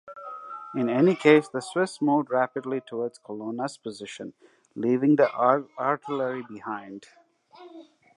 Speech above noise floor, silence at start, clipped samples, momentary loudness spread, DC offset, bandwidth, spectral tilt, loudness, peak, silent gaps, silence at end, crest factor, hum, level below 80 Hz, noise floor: 26 dB; 0.05 s; under 0.1%; 18 LU; under 0.1%; 11 kHz; -6.5 dB/octave; -25 LUFS; -4 dBFS; none; 0.35 s; 22 dB; none; -80 dBFS; -51 dBFS